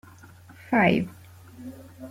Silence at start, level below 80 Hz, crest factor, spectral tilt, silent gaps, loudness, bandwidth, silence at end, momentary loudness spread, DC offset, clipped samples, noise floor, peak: 0.7 s; -62 dBFS; 20 dB; -7 dB/octave; none; -23 LUFS; 16 kHz; 0 s; 23 LU; under 0.1%; under 0.1%; -49 dBFS; -8 dBFS